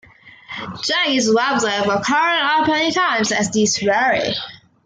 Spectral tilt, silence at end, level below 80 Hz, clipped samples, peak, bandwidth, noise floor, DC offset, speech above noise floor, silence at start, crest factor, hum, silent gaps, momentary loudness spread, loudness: -2.5 dB/octave; 0.3 s; -60 dBFS; under 0.1%; -6 dBFS; 10 kHz; -40 dBFS; under 0.1%; 23 dB; 0.25 s; 14 dB; none; none; 10 LU; -17 LUFS